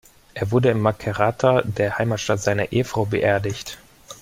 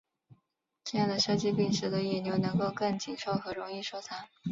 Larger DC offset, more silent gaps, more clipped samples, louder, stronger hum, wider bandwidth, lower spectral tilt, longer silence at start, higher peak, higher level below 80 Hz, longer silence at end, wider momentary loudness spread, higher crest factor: neither; neither; neither; first, -21 LUFS vs -32 LUFS; neither; first, 16 kHz vs 7.8 kHz; about the same, -6 dB/octave vs -5 dB/octave; second, 0.35 s vs 0.85 s; first, -4 dBFS vs -16 dBFS; first, -50 dBFS vs -66 dBFS; about the same, 0.05 s vs 0 s; about the same, 11 LU vs 11 LU; about the same, 18 dB vs 16 dB